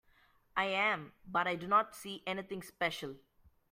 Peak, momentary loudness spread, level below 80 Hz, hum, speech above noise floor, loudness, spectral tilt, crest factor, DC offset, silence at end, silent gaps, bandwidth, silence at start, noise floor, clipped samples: -16 dBFS; 12 LU; -72 dBFS; none; 33 dB; -35 LUFS; -4 dB/octave; 20 dB; under 0.1%; 0.55 s; none; 16 kHz; 0.55 s; -68 dBFS; under 0.1%